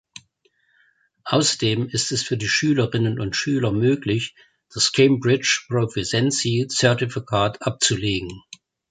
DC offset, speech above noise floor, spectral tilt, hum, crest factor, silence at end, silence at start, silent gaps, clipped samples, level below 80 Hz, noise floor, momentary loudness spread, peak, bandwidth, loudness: under 0.1%; 44 dB; -4 dB/octave; none; 20 dB; 0.5 s; 1.25 s; none; under 0.1%; -52 dBFS; -65 dBFS; 7 LU; -2 dBFS; 9.6 kHz; -21 LUFS